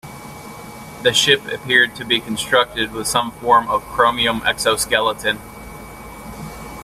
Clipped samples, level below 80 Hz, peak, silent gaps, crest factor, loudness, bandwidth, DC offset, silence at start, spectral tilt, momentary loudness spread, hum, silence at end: under 0.1%; -44 dBFS; 0 dBFS; none; 20 dB; -17 LUFS; 16 kHz; under 0.1%; 0.05 s; -2 dB/octave; 20 LU; none; 0 s